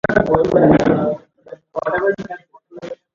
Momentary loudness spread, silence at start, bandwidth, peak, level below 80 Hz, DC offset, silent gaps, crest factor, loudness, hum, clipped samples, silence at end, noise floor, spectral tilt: 21 LU; 0.1 s; 7.4 kHz; 0 dBFS; -42 dBFS; under 0.1%; none; 18 dB; -16 LUFS; none; under 0.1%; 0.2 s; -40 dBFS; -8 dB/octave